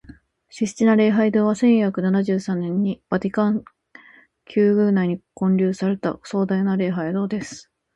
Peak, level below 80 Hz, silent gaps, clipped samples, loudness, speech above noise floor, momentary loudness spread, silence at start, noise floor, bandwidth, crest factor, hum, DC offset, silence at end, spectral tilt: -4 dBFS; -60 dBFS; none; under 0.1%; -21 LUFS; 31 dB; 10 LU; 0.55 s; -51 dBFS; 9 kHz; 16 dB; none; under 0.1%; 0.35 s; -7.5 dB/octave